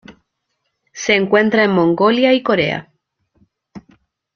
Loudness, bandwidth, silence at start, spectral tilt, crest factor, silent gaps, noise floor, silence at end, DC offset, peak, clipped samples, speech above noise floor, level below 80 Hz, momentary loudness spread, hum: -15 LUFS; 7.2 kHz; 0.1 s; -5 dB/octave; 16 dB; none; -72 dBFS; 0.55 s; under 0.1%; 0 dBFS; under 0.1%; 58 dB; -58 dBFS; 8 LU; none